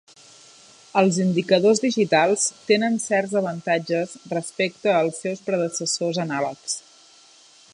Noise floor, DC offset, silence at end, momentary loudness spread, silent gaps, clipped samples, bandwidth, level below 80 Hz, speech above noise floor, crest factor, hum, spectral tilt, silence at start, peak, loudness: -52 dBFS; under 0.1%; 0.95 s; 10 LU; none; under 0.1%; 11.5 kHz; -74 dBFS; 30 dB; 20 dB; none; -4 dB/octave; 0.95 s; -4 dBFS; -22 LUFS